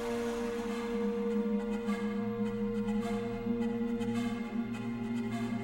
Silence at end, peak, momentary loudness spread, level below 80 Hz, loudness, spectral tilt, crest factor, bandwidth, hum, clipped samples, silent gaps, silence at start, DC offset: 0 s; -22 dBFS; 3 LU; -54 dBFS; -35 LUFS; -7 dB/octave; 12 dB; 16 kHz; none; under 0.1%; none; 0 s; under 0.1%